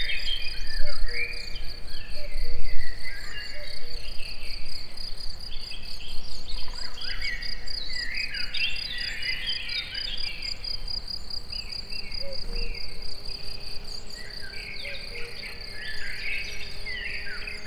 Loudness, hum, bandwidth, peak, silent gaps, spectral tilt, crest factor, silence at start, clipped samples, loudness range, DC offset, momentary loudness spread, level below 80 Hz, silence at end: -33 LUFS; none; 10.5 kHz; -4 dBFS; none; -2.5 dB/octave; 16 dB; 0 s; under 0.1%; 7 LU; under 0.1%; 9 LU; -34 dBFS; 0 s